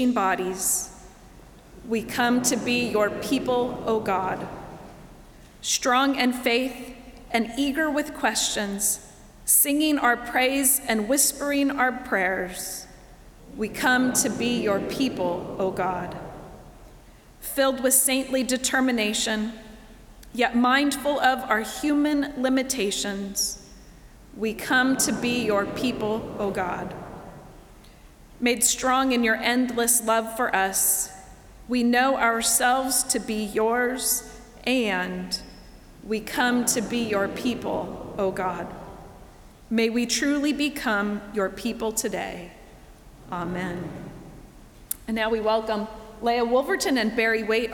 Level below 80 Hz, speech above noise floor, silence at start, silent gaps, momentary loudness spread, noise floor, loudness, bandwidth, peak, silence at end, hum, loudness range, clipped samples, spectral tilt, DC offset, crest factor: -50 dBFS; 25 dB; 0 s; none; 13 LU; -49 dBFS; -24 LUFS; over 20 kHz; -2 dBFS; 0 s; none; 6 LU; under 0.1%; -2.5 dB/octave; under 0.1%; 24 dB